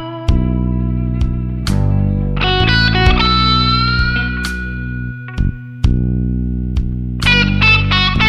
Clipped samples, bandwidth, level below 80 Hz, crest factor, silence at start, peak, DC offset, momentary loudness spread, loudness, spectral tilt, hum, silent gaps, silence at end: under 0.1%; 12 kHz; -20 dBFS; 14 dB; 0 s; 0 dBFS; 0.1%; 10 LU; -15 LUFS; -6 dB/octave; none; none; 0 s